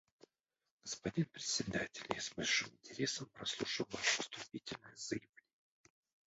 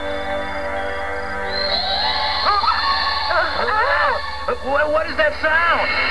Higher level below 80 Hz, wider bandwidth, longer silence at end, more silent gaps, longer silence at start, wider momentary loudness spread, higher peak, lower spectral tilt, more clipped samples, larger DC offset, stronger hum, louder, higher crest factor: second, -72 dBFS vs -38 dBFS; second, 8 kHz vs 11 kHz; first, 1.1 s vs 0 s; neither; first, 0.85 s vs 0 s; first, 12 LU vs 8 LU; second, -16 dBFS vs -4 dBFS; about the same, -2.5 dB/octave vs -3.5 dB/octave; neither; second, under 0.1% vs 3%; neither; second, -40 LUFS vs -19 LUFS; first, 26 dB vs 16 dB